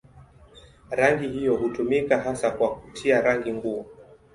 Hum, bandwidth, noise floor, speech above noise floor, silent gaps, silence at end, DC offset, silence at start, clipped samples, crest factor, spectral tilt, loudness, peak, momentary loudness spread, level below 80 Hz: none; 11.5 kHz; -51 dBFS; 27 dB; none; 0.3 s; under 0.1%; 0.15 s; under 0.1%; 20 dB; -5.5 dB/octave; -24 LUFS; -4 dBFS; 9 LU; -54 dBFS